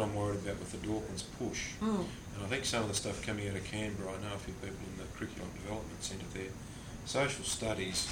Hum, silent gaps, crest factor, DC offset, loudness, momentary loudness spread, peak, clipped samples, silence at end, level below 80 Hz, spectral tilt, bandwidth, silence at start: none; none; 18 dB; under 0.1%; -38 LUFS; 10 LU; -18 dBFS; under 0.1%; 0 s; -52 dBFS; -4 dB/octave; 17 kHz; 0 s